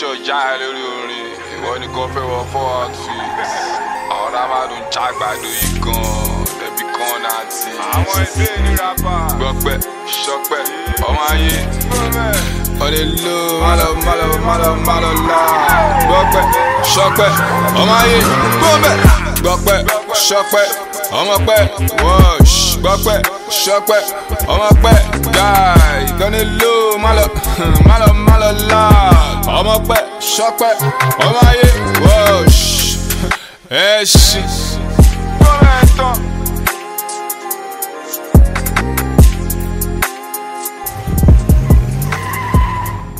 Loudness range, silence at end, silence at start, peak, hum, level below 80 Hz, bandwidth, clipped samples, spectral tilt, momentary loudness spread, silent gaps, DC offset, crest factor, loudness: 8 LU; 0 s; 0 s; 0 dBFS; none; -16 dBFS; 16.5 kHz; under 0.1%; -4.5 dB/octave; 12 LU; none; under 0.1%; 12 dB; -12 LUFS